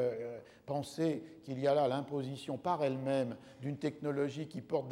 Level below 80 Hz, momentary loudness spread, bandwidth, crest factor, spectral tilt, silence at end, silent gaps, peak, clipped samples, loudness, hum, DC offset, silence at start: -78 dBFS; 11 LU; 15.5 kHz; 16 dB; -7 dB/octave; 0 s; none; -20 dBFS; under 0.1%; -37 LUFS; none; under 0.1%; 0 s